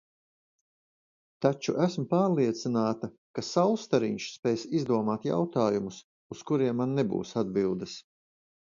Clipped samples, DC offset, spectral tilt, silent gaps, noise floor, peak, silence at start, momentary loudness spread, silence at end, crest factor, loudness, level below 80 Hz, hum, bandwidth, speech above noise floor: under 0.1%; under 0.1%; -6.5 dB/octave; 3.18-3.34 s, 4.39-4.43 s, 6.04-6.30 s; under -90 dBFS; -10 dBFS; 1.4 s; 11 LU; 0.75 s; 20 dB; -29 LUFS; -68 dBFS; none; 7.6 kHz; over 62 dB